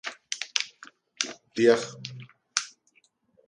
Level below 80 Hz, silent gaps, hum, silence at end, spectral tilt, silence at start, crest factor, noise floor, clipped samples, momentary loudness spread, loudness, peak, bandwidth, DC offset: -78 dBFS; none; none; 0.8 s; -2.5 dB/octave; 0.05 s; 28 dB; -67 dBFS; under 0.1%; 19 LU; -28 LUFS; -2 dBFS; 11.5 kHz; under 0.1%